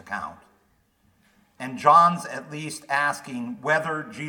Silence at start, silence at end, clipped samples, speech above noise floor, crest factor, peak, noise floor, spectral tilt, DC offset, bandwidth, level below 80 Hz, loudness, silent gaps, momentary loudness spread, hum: 0.05 s; 0 s; under 0.1%; 41 dB; 22 dB; -4 dBFS; -65 dBFS; -4.5 dB/octave; under 0.1%; 18.5 kHz; -70 dBFS; -23 LUFS; none; 18 LU; none